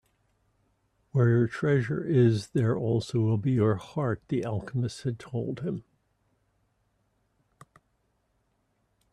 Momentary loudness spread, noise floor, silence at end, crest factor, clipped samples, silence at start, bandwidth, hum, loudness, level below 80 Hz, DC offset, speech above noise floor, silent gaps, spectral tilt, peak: 10 LU; -73 dBFS; 3.3 s; 18 dB; under 0.1%; 1.15 s; 10.5 kHz; none; -28 LUFS; -62 dBFS; under 0.1%; 47 dB; none; -8 dB/octave; -10 dBFS